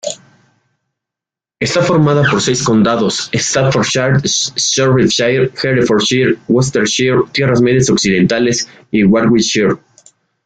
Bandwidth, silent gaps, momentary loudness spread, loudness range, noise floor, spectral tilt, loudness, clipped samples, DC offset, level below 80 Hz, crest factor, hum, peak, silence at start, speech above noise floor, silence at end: 9.4 kHz; none; 4 LU; 2 LU; -86 dBFS; -4.5 dB/octave; -12 LUFS; under 0.1%; under 0.1%; -46 dBFS; 12 dB; none; -2 dBFS; 0.05 s; 74 dB; 0.7 s